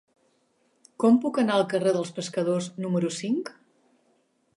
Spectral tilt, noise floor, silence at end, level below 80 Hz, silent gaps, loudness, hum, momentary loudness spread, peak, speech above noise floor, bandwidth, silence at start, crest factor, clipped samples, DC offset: -6 dB/octave; -68 dBFS; 1.05 s; -78 dBFS; none; -25 LUFS; none; 8 LU; -10 dBFS; 44 dB; 11.5 kHz; 1 s; 16 dB; under 0.1%; under 0.1%